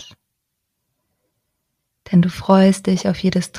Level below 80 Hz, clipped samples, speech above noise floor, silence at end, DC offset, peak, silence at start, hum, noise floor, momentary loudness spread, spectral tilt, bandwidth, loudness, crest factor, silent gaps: -50 dBFS; under 0.1%; 60 dB; 0 s; under 0.1%; -4 dBFS; 2.1 s; none; -76 dBFS; 6 LU; -6.5 dB/octave; 12 kHz; -16 LUFS; 16 dB; none